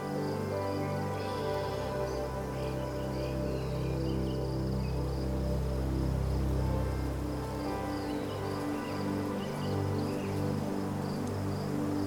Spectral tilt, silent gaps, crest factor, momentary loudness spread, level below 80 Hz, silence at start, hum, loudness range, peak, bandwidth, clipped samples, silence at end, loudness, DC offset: -7 dB/octave; none; 14 dB; 3 LU; -40 dBFS; 0 s; none; 2 LU; -20 dBFS; over 20 kHz; under 0.1%; 0 s; -34 LUFS; under 0.1%